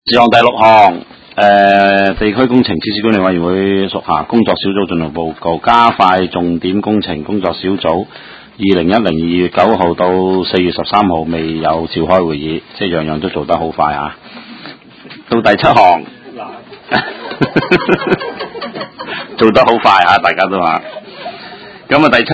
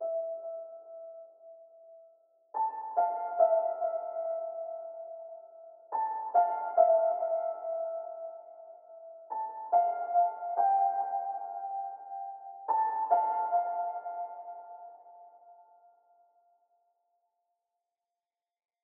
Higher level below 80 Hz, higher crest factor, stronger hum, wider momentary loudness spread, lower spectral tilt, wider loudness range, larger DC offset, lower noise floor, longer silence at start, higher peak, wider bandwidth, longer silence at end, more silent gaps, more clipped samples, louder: first, -40 dBFS vs under -90 dBFS; second, 12 dB vs 22 dB; neither; second, 18 LU vs 22 LU; first, -7 dB/octave vs 8 dB/octave; second, 4 LU vs 7 LU; neither; second, -35 dBFS vs under -90 dBFS; about the same, 0.05 s vs 0 s; first, 0 dBFS vs -12 dBFS; first, 8 kHz vs 2.2 kHz; second, 0 s vs 3.25 s; neither; first, 0.5% vs under 0.1%; first, -11 LUFS vs -31 LUFS